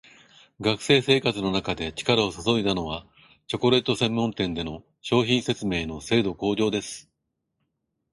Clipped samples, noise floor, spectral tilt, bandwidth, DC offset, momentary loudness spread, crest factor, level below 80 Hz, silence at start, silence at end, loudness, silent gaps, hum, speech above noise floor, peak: under 0.1%; -80 dBFS; -5 dB/octave; 11.5 kHz; under 0.1%; 12 LU; 20 dB; -50 dBFS; 0.6 s; 1.1 s; -24 LUFS; none; none; 55 dB; -6 dBFS